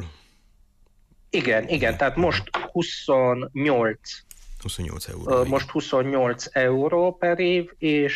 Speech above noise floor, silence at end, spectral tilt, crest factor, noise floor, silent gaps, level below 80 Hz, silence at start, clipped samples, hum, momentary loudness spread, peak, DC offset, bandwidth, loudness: 35 dB; 0 s; -5.5 dB/octave; 14 dB; -58 dBFS; none; -44 dBFS; 0 s; under 0.1%; none; 12 LU; -10 dBFS; under 0.1%; 14 kHz; -23 LUFS